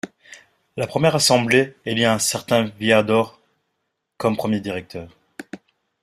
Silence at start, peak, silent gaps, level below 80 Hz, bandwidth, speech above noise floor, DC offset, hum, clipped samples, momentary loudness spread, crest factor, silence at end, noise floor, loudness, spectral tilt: 0.05 s; -2 dBFS; none; -58 dBFS; 15.5 kHz; 56 dB; under 0.1%; none; under 0.1%; 21 LU; 20 dB; 0.45 s; -76 dBFS; -19 LUFS; -4 dB/octave